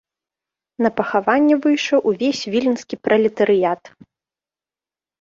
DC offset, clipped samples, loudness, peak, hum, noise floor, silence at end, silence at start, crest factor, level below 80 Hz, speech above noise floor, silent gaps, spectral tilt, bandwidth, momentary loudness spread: under 0.1%; under 0.1%; -18 LUFS; -2 dBFS; none; under -90 dBFS; 1.35 s; 0.8 s; 18 dB; -64 dBFS; over 72 dB; none; -5 dB/octave; 7.6 kHz; 6 LU